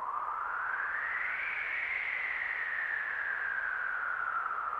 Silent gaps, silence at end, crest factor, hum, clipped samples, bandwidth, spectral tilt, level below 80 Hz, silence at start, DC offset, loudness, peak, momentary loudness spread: none; 0 s; 14 dB; none; under 0.1%; 11.5 kHz; -2.5 dB/octave; -70 dBFS; 0 s; under 0.1%; -33 LUFS; -22 dBFS; 2 LU